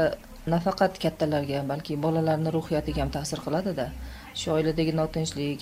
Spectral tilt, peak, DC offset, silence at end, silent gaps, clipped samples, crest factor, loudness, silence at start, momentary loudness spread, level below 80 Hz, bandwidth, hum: -6 dB/octave; -10 dBFS; under 0.1%; 0 s; none; under 0.1%; 18 dB; -28 LUFS; 0 s; 7 LU; -44 dBFS; 16 kHz; none